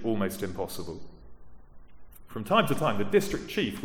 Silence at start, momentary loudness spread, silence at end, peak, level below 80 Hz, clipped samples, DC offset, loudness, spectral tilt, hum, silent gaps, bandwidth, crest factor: 0 s; 16 LU; 0 s; -8 dBFS; -52 dBFS; under 0.1%; under 0.1%; -29 LUFS; -5 dB/octave; none; none; 18 kHz; 20 dB